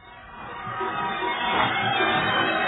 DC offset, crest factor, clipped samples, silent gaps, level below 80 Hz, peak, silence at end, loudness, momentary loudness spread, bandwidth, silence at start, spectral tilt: under 0.1%; 16 dB; under 0.1%; none; -54 dBFS; -8 dBFS; 0 s; -24 LUFS; 16 LU; 4.1 kHz; 0 s; -7 dB/octave